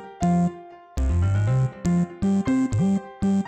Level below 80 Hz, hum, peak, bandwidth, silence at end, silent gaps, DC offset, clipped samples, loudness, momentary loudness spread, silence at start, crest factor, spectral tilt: -34 dBFS; none; -12 dBFS; 9 kHz; 0 s; none; under 0.1%; under 0.1%; -23 LUFS; 6 LU; 0 s; 10 dB; -8 dB/octave